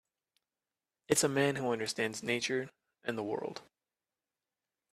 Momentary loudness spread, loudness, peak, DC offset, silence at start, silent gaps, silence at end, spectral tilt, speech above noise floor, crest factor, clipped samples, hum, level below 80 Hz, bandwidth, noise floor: 14 LU; -34 LUFS; -12 dBFS; under 0.1%; 1.1 s; none; 1.3 s; -3.5 dB/octave; over 56 dB; 24 dB; under 0.1%; none; -76 dBFS; 15 kHz; under -90 dBFS